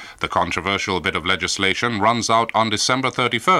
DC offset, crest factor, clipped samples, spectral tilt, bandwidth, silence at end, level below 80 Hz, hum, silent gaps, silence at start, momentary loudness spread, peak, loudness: under 0.1%; 18 dB; under 0.1%; -3 dB/octave; 16 kHz; 0 s; -50 dBFS; none; none; 0 s; 3 LU; -2 dBFS; -19 LUFS